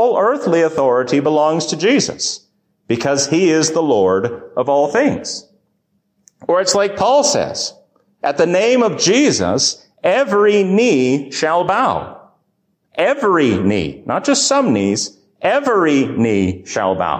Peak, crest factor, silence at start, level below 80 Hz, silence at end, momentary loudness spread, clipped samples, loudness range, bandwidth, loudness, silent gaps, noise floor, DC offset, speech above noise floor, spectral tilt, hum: -2 dBFS; 14 dB; 0 s; -48 dBFS; 0 s; 8 LU; under 0.1%; 3 LU; 15 kHz; -15 LUFS; none; -66 dBFS; under 0.1%; 51 dB; -4 dB/octave; none